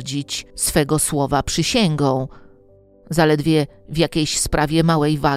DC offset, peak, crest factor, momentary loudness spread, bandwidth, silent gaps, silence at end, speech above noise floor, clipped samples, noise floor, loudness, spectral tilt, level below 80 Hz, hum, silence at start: under 0.1%; 0 dBFS; 18 dB; 8 LU; 15.5 kHz; none; 0 s; 32 dB; under 0.1%; -50 dBFS; -19 LUFS; -4.5 dB/octave; -38 dBFS; none; 0 s